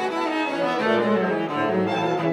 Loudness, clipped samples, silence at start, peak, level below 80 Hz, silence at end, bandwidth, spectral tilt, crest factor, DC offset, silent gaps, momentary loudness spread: -23 LUFS; under 0.1%; 0 s; -10 dBFS; -74 dBFS; 0 s; 12 kHz; -6 dB/octave; 14 dB; under 0.1%; none; 3 LU